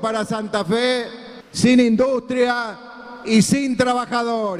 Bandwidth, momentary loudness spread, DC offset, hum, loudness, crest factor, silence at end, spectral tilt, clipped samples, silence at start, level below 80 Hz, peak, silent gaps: 14 kHz; 17 LU; under 0.1%; none; -19 LUFS; 16 dB; 0 s; -5 dB/octave; under 0.1%; 0 s; -54 dBFS; -2 dBFS; none